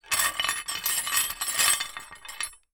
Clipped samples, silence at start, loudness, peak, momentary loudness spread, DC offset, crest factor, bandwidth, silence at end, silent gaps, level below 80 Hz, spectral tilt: under 0.1%; 0.05 s; -25 LUFS; -6 dBFS; 13 LU; under 0.1%; 24 dB; over 20 kHz; 0.15 s; none; -58 dBFS; 2 dB/octave